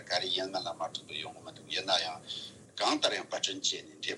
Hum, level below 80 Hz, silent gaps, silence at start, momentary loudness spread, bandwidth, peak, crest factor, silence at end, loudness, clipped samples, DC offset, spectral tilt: none; -82 dBFS; none; 0 s; 12 LU; 12 kHz; -14 dBFS; 22 dB; 0 s; -33 LUFS; under 0.1%; under 0.1%; -1.5 dB/octave